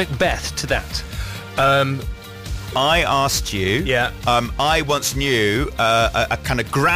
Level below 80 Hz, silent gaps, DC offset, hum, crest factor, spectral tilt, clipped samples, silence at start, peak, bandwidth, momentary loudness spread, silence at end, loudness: -32 dBFS; none; under 0.1%; none; 12 dB; -4 dB/octave; under 0.1%; 0 s; -6 dBFS; 15.5 kHz; 11 LU; 0 s; -19 LUFS